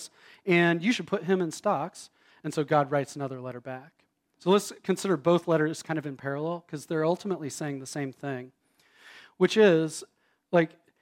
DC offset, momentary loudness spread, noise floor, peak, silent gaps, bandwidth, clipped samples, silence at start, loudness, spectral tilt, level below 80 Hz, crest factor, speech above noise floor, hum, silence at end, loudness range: under 0.1%; 15 LU; -59 dBFS; -10 dBFS; none; 16.5 kHz; under 0.1%; 0 s; -28 LUFS; -5.5 dB/octave; -78 dBFS; 20 dB; 32 dB; none; 0.35 s; 5 LU